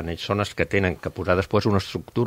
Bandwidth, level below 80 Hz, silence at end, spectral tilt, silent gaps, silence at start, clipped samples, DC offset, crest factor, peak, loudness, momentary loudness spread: 16 kHz; -46 dBFS; 0 s; -6.5 dB/octave; none; 0 s; under 0.1%; under 0.1%; 20 dB; -4 dBFS; -24 LUFS; 5 LU